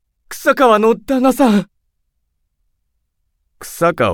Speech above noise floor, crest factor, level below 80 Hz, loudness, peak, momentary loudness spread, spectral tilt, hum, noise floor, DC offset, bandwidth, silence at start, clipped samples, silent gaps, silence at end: 55 dB; 16 dB; -50 dBFS; -14 LUFS; 0 dBFS; 21 LU; -5.5 dB/octave; none; -68 dBFS; under 0.1%; 18 kHz; 0.3 s; under 0.1%; none; 0 s